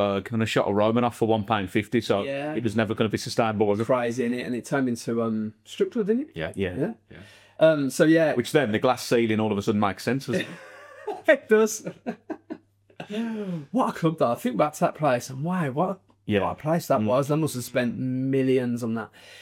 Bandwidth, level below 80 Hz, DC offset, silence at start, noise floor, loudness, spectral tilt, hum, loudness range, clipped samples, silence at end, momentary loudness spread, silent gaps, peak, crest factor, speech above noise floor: 16.5 kHz; -66 dBFS; under 0.1%; 0 s; -45 dBFS; -25 LUFS; -6 dB/octave; none; 4 LU; under 0.1%; 0 s; 12 LU; none; -6 dBFS; 20 dB; 21 dB